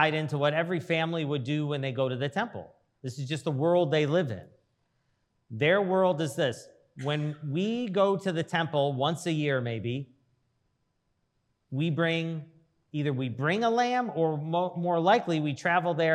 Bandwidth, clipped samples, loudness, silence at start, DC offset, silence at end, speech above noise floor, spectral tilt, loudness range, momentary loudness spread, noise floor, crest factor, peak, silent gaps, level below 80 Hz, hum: 12.5 kHz; under 0.1%; -28 LUFS; 0 s; under 0.1%; 0 s; 48 dB; -6.5 dB/octave; 5 LU; 11 LU; -76 dBFS; 20 dB; -8 dBFS; none; -78 dBFS; none